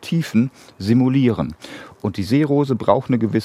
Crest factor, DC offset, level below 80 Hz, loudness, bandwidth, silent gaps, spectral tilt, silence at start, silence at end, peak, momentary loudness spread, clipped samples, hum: 18 dB; under 0.1%; -54 dBFS; -19 LUFS; 13.5 kHz; none; -8 dB/octave; 0 s; 0 s; 0 dBFS; 11 LU; under 0.1%; none